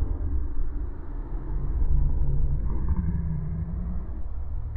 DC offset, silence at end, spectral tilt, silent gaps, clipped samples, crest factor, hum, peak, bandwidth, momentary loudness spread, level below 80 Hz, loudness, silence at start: under 0.1%; 0 s; -13 dB/octave; none; under 0.1%; 12 dB; none; -12 dBFS; 2.2 kHz; 9 LU; -26 dBFS; -31 LUFS; 0 s